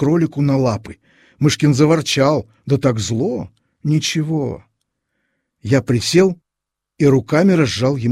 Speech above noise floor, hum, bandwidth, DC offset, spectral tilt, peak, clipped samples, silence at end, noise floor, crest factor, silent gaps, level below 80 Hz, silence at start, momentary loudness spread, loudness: 67 dB; none; 14 kHz; under 0.1%; -6 dB/octave; -2 dBFS; under 0.1%; 0 s; -83 dBFS; 16 dB; none; -48 dBFS; 0 s; 13 LU; -17 LUFS